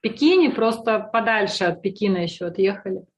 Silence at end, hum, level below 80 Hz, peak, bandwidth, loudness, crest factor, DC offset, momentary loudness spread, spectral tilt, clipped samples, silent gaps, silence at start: 0.15 s; none; -64 dBFS; -6 dBFS; 12 kHz; -21 LUFS; 14 dB; under 0.1%; 8 LU; -5.5 dB/octave; under 0.1%; none; 0.05 s